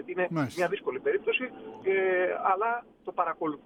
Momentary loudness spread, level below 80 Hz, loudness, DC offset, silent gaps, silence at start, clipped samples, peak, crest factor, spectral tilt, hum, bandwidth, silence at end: 8 LU; -72 dBFS; -29 LUFS; under 0.1%; none; 0 s; under 0.1%; -12 dBFS; 18 dB; -6 dB/octave; none; 12.5 kHz; 0.1 s